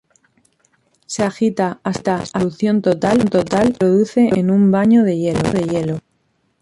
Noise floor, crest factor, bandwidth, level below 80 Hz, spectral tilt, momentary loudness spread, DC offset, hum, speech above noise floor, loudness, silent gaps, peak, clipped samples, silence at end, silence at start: -64 dBFS; 14 dB; 11.5 kHz; -48 dBFS; -7 dB/octave; 8 LU; under 0.1%; none; 49 dB; -16 LUFS; none; -4 dBFS; under 0.1%; 0.65 s; 1.1 s